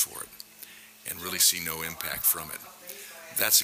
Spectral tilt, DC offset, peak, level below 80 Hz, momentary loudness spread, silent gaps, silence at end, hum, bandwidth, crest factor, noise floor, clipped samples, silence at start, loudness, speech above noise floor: 0.5 dB/octave; under 0.1%; -8 dBFS; -62 dBFS; 21 LU; none; 0 s; none; 16 kHz; 22 dB; -49 dBFS; under 0.1%; 0 s; -26 LUFS; 21 dB